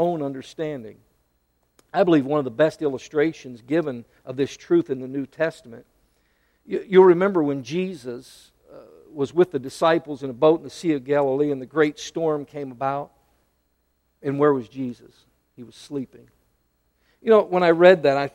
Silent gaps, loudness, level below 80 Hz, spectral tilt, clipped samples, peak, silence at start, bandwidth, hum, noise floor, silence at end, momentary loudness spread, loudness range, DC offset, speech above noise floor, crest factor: none; -22 LUFS; -64 dBFS; -6.5 dB/octave; under 0.1%; -2 dBFS; 0 s; 11.5 kHz; none; -69 dBFS; 0.05 s; 17 LU; 6 LU; under 0.1%; 48 dB; 22 dB